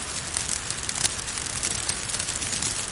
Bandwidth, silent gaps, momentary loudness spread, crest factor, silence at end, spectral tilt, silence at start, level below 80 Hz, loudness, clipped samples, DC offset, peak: 12 kHz; none; 3 LU; 30 dB; 0 s; -0.5 dB/octave; 0 s; -46 dBFS; -26 LUFS; under 0.1%; under 0.1%; 0 dBFS